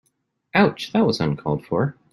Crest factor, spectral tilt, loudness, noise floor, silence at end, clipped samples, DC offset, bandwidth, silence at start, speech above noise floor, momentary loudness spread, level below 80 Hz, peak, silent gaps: 18 dB; -7 dB/octave; -21 LUFS; -71 dBFS; 0.2 s; under 0.1%; under 0.1%; 12 kHz; 0.55 s; 51 dB; 5 LU; -54 dBFS; -4 dBFS; none